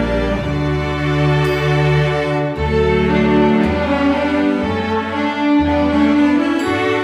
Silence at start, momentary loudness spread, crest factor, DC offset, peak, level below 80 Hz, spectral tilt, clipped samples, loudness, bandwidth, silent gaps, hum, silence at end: 0 s; 5 LU; 12 dB; under 0.1%; -4 dBFS; -30 dBFS; -7.5 dB/octave; under 0.1%; -16 LUFS; 12 kHz; none; none; 0 s